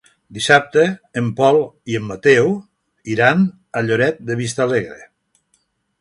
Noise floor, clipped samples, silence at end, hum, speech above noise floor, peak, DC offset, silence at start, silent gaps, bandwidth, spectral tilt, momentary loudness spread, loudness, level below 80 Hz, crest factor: -65 dBFS; under 0.1%; 0.95 s; none; 48 dB; 0 dBFS; under 0.1%; 0.3 s; none; 11.5 kHz; -5.5 dB/octave; 11 LU; -17 LUFS; -56 dBFS; 18 dB